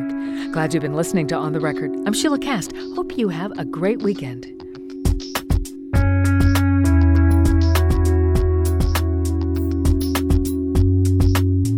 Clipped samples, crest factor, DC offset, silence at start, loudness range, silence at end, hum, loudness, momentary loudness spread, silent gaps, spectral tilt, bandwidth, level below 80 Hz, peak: under 0.1%; 12 dB; under 0.1%; 0 s; 6 LU; 0 s; none; -19 LUFS; 10 LU; none; -6.5 dB/octave; 16.5 kHz; -24 dBFS; -6 dBFS